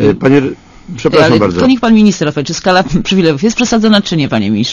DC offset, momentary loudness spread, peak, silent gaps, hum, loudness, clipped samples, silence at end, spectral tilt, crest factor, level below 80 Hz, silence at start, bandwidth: under 0.1%; 7 LU; 0 dBFS; none; none; -10 LUFS; 0.7%; 0 s; -5.5 dB/octave; 10 dB; -36 dBFS; 0 s; 7.4 kHz